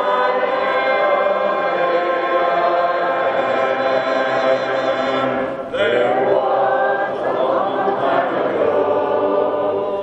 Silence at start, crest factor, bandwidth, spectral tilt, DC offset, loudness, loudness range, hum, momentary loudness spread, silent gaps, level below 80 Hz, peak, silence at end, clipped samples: 0 s; 14 dB; 8.2 kHz; -5.5 dB/octave; under 0.1%; -18 LUFS; 1 LU; none; 3 LU; none; -60 dBFS; -4 dBFS; 0 s; under 0.1%